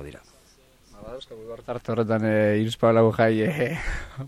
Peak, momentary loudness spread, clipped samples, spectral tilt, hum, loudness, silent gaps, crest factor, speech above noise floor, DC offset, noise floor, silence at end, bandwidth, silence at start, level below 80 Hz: -8 dBFS; 20 LU; under 0.1%; -7 dB/octave; none; -23 LUFS; none; 16 dB; 33 dB; under 0.1%; -56 dBFS; 0 s; 14 kHz; 0 s; -42 dBFS